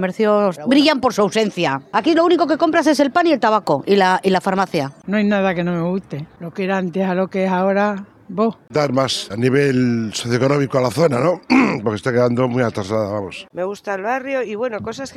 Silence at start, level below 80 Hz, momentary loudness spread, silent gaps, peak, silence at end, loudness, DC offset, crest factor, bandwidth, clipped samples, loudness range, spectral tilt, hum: 0 s; -56 dBFS; 9 LU; none; -2 dBFS; 0.05 s; -18 LUFS; under 0.1%; 16 dB; 13.5 kHz; under 0.1%; 4 LU; -6 dB/octave; none